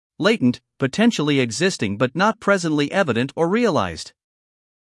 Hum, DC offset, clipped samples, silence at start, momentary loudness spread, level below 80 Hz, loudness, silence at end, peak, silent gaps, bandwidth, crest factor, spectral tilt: none; under 0.1%; under 0.1%; 0.2 s; 7 LU; -60 dBFS; -20 LUFS; 0.85 s; -4 dBFS; none; 12 kHz; 16 dB; -5 dB/octave